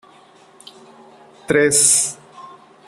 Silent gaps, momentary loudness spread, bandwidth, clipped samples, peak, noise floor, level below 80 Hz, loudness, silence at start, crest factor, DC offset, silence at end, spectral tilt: none; 13 LU; 14.5 kHz; under 0.1%; 0 dBFS; -48 dBFS; -60 dBFS; -14 LUFS; 1.5 s; 22 dB; under 0.1%; 0.4 s; -2 dB/octave